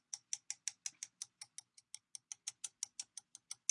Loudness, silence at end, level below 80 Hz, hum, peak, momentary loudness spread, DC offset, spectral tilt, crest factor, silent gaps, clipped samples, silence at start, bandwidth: -47 LUFS; 0.15 s; under -90 dBFS; none; -18 dBFS; 11 LU; under 0.1%; 4 dB/octave; 32 dB; none; under 0.1%; 0.1 s; 12 kHz